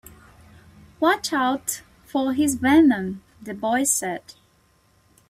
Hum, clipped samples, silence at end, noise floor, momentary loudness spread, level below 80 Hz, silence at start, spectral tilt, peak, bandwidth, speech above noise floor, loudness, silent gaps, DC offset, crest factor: none; under 0.1%; 1.1 s; -61 dBFS; 17 LU; -58 dBFS; 1 s; -3.5 dB/octave; -6 dBFS; 16 kHz; 40 dB; -21 LUFS; none; under 0.1%; 18 dB